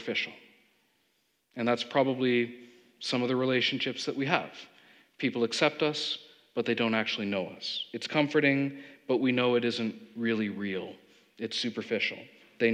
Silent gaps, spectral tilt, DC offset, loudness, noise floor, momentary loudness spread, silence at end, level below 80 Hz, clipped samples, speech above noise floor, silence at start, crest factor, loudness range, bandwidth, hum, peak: none; -5 dB/octave; under 0.1%; -30 LUFS; -74 dBFS; 11 LU; 0 s; -88 dBFS; under 0.1%; 44 dB; 0 s; 24 dB; 2 LU; 10.5 kHz; none; -8 dBFS